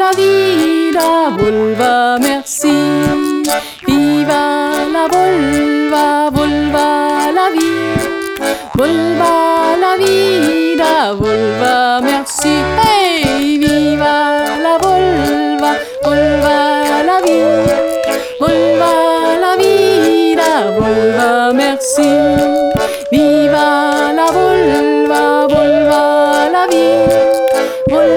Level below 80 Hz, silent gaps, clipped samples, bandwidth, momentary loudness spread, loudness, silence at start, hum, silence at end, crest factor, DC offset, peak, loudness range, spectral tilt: -40 dBFS; none; under 0.1%; over 20 kHz; 4 LU; -11 LUFS; 0 s; none; 0 s; 10 dB; under 0.1%; 0 dBFS; 2 LU; -4.5 dB/octave